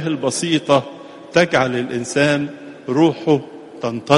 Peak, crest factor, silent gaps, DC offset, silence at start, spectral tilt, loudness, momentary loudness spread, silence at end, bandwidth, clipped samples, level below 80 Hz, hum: 0 dBFS; 18 dB; none; under 0.1%; 0 s; -5 dB/octave; -18 LUFS; 14 LU; 0 s; 11.5 kHz; under 0.1%; -58 dBFS; none